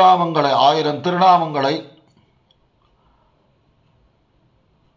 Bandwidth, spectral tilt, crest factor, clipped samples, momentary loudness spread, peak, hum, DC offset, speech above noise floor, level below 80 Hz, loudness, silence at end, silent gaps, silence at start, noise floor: 7.4 kHz; -6 dB/octave; 18 dB; under 0.1%; 7 LU; -2 dBFS; none; under 0.1%; 44 dB; -66 dBFS; -16 LUFS; 3.1 s; none; 0 s; -60 dBFS